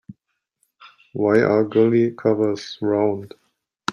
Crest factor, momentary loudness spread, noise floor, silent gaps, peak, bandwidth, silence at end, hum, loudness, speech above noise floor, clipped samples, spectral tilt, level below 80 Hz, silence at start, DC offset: 18 dB; 12 LU; -75 dBFS; none; -4 dBFS; 10.5 kHz; 0 s; none; -20 LUFS; 56 dB; under 0.1%; -7 dB/octave; -64 dBFS; 0.1 s; under 0.1%